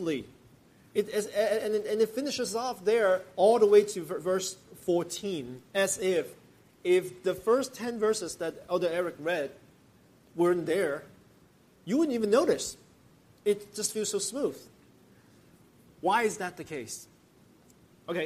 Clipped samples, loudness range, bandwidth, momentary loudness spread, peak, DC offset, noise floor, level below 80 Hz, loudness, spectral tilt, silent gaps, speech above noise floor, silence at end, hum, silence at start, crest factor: under 0.1%; 7 LU; 15.5 kHz; 13 LU; -10 dBFS; under 0.1%; -61 dBFS; -70 dBFS; -29 LUFS; -4 dB/octave; none; 32 dB; 0 s; none; 0 s; 20 dB